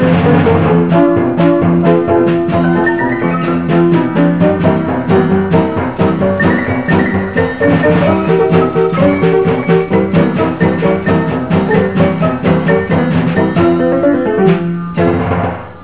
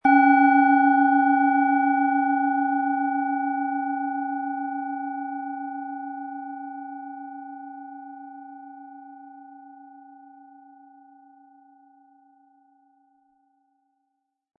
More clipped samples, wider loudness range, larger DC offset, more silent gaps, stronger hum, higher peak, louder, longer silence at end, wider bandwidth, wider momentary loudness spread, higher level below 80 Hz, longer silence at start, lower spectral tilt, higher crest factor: neither; second, 1 LU vs 24 LU; first, 1% vs under 0.1%; neither; neither; first, 0 dBFS vs -6 dBFS; first, -11 LUFS vs -22 LUFS; second, 0 s vs 4.7 s; second, 4 kHz vs 4.5 kHz; second, 4 LU vs 25 LU; first, -32 dBFS vs -78 dBFS; about the same, 0 s vs 0.05 s; first, -12 dB/octave vs -7 dB/octave; second, 10 dB vs 18 dB